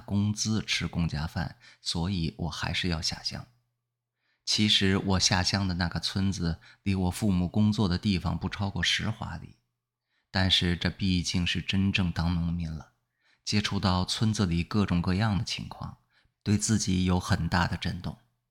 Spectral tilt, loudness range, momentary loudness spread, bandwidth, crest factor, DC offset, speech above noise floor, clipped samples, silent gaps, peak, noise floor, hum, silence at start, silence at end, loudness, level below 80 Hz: -4.5 dB/octave; 3 LU; 12 LU; 16 kHz; 20 dB; under 0.1%; 56 dB; under 0.1%; none; -8 dBFS; -84 dBFS; none; 0 s; 0.35 s; -28 LUFS; -50 dBFS